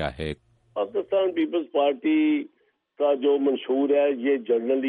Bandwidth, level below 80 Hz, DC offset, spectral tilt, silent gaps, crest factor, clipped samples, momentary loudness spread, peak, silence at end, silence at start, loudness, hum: 4.7 kHz; -52 dBFS; under 0.1%; -7.5 dB/octave; none; 12 dB; under 0.1%; 11 LU; -10 dBFS; 0 s; 0 s; -24 LUFS; none